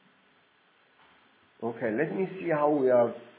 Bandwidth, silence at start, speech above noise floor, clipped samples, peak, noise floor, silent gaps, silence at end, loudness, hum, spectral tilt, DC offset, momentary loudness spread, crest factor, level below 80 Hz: 4 kHz; 1.6 s; 38 dB; under 0.1%; -12 dBFS; -65 dBFS; none; 0.1 s; -28 LUFS; none; -11 dB/octave; under 0.1%; 11 LU; 18 dB; -80 dBFS